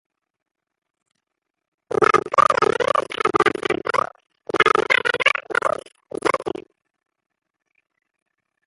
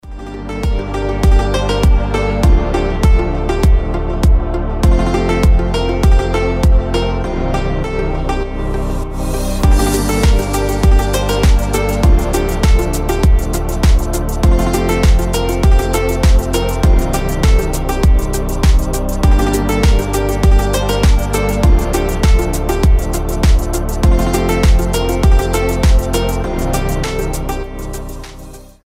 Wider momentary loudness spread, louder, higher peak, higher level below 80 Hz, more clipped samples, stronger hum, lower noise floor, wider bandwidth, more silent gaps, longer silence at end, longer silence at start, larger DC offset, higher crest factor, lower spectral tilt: first, 12 LU vs 7 LU; second, -19 LUFS vs -15 LUFS; about the same, -2 dBFS vs 0 dBFS; second, -58 dBFS vs -14 dBFS; neither; neither; first, -80 dBFS vs -33 dBFS; second, 11.5 kHz vs 16 kHz; neither; first, 2.05 s vs 0.25 s; first, 1.9 s vs 0.05 s; neither; first, 22 dB vs 12 dB; second, -3.5 dB/octave vs -6 dB/octave